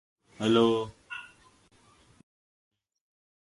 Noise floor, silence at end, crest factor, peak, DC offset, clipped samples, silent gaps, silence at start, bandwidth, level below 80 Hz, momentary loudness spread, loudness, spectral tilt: -62 dBFS; 2.2 s; 22 dB; -10 dBFS; under 0.1%; under 0.1%; none; 0.4 s; 11.5 kHz; -66 dBFS; 18 LU; -27 LUFS; -6 dB/octave